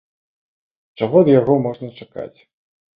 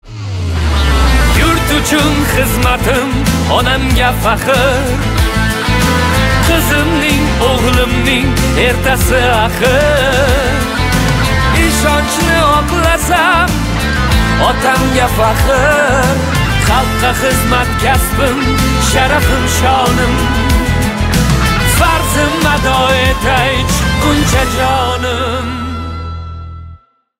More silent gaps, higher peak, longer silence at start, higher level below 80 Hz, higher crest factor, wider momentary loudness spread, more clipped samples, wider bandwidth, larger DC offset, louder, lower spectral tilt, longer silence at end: neither; about the same, -2 dBFS vs 0 dBFS; first, 1 s vs 0.05 s; second, -58 dBFS vs -18 dBFS; first, 18 dB vs 10 dB; first, 20 LU vs 4 LU; neither; second, 5 kHz vs 16.5 kHz; neither; second, -16 LUFS vs -11 LUFS; first, -11.5 dB/octave vs -4.5 dB/octave; first, 0.7 s vs 0.45 s